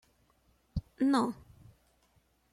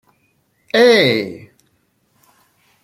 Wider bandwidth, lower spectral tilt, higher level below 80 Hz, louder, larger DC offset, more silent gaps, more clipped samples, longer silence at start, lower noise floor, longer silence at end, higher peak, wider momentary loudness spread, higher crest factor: second, 13 kHz vs 15 kHz; first, -6.5 dB/octave vs -4.5 dB/octave; first, -54 dBFS vs -64 dBFS; second, -32 LUFS vs -13 LUFS; neither; neither; neither; about the same, 0.75 s vs 0.75 s; first, -70 dBFS vs -62 dBFS; second, 1.2 s vs 1.5 s; second, -16 dBFS vs 0 dBFS; second, 14 LU vs 20 LU; about the same, 20 dB vs 18 dB